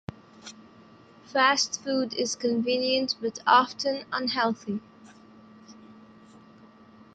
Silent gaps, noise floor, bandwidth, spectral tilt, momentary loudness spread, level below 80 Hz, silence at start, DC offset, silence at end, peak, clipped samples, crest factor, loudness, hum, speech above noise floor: none; -53 dBFS; 9.2 kHz; -2.5 dB/octave; 21 LU; -70 dBFS; 0.45 s; under 0.1%; 1.2 s; -6 dBFS; under 0.1%; 22 dB; -26 LUFS; none; 27 dB